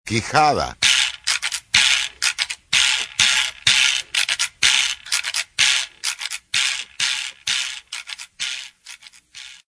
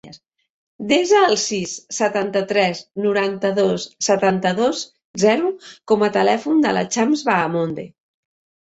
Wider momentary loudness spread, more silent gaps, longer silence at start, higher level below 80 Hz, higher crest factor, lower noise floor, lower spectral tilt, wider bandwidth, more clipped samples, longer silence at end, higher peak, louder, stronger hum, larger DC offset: about the same, 12 LU vs 10 LU; second, none vs 0.50-0.79 s, 5.05-5.14 s; about the same, 0.05 s vs 0.05 s; first, -52 dBFS vs -62 dBFS; first, 22 dB vs 16 dB; about the same, -43 dBFS vs -45 dBFS; second, 0 dB/octave vs -4 dB/octave; first, 11 kHz vs 8.2 kHz; neither; second, 0.15 s vs 0.85 s; about the same, 0 dBFS vs -2 dBFS; about the same, -18 LUFS vs -19 LUFS; neither; neither